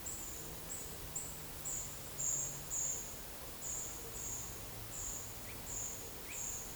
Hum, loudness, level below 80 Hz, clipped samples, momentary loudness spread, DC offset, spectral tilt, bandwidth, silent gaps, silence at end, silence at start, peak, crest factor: none; -41 LUFS; -58 dBFS; under 0.1%; 8 LU; under 0.1%; -1.5 dB/octave; over 20 kHz; none; 0 s; 0 s; -26 dBFS; 18 dB